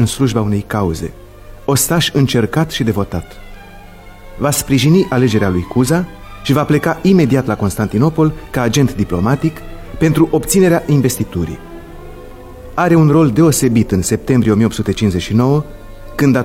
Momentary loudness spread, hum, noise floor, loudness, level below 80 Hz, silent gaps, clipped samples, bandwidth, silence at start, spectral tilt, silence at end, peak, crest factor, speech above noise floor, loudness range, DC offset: 15 LU; 50 Hz at -40 dBFS; -35 dBFS; -14 LUFS; -34 dBFS; none; under 0.1%; 16.5 kHz; 0 s; -5.5 dB/octave; 0 s; 0 dBFS; 14 dB; 22 dB; 3 LU; under 0.1%